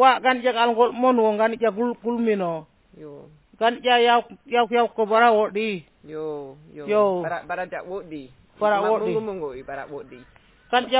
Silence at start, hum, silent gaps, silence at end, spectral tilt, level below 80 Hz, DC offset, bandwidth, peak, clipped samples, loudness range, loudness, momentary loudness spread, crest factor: 0 s; none; none; 0 s; -8.5 dB/octave; -62 dBFS; under 0.1%; 4 kHz; -4 dBFS; under 0.1%; 6 LU; -22 LUFS; 18 LU; 18 dB